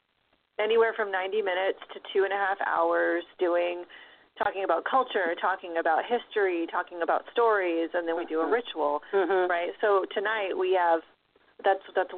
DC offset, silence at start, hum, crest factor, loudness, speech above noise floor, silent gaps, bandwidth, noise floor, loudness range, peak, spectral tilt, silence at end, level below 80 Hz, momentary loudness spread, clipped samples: under 0.1%; 0.6 s; none; 16 dB; -27 LUFS; 44 dB; none; 4.4 kHz; -71 dBFS; 1 LU; -12 dBFS; 0 dB/octave; 0 s; -74 dBFS; 6 LU; under 0.1%